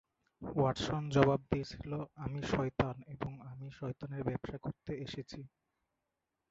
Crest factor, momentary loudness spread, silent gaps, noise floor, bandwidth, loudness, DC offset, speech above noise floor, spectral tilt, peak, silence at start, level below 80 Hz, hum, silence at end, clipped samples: 26 dB; 17 LU; none; -87 dBFS; 7.6 kHz; -37 LUFS; under 0.1%; 51 dB; -6 dB/octave; -12 dBFS; 0.4 s; -56 dBFS; none; 1.05 s; under 0.1%